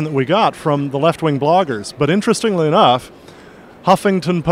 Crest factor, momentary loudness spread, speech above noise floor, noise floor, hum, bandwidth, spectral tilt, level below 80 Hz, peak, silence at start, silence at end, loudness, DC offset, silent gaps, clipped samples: 16 dB; 7 LU; 25 dB; -40 dBFS; none; 16 kHz; -6 dB/octave; -50 dBFS; 0 dBFS; 0 s; 0 s; -15 LUFS; under 0.1%; none; under 0.1%